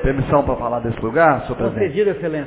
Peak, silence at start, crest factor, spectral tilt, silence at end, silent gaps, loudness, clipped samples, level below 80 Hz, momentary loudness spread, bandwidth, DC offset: -2 dBFS; 0 s; 16 dB; -11 dB/octave; 0 s; none; -18 LUFS; under 0.1%; -34 dBFS; 7 LU; 4 kHz; under 0.1%